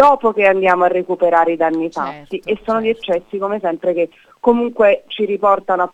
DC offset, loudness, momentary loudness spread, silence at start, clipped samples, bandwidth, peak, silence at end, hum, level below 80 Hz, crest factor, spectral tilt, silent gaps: under 0.1%; -16 LUFS; 9 LU; 0 s; under 0.1%; 8.8 kHz; 0 dBFS; 0.05 s; none; -54 dBFS; 14 dB; -6.5 dB/octave; none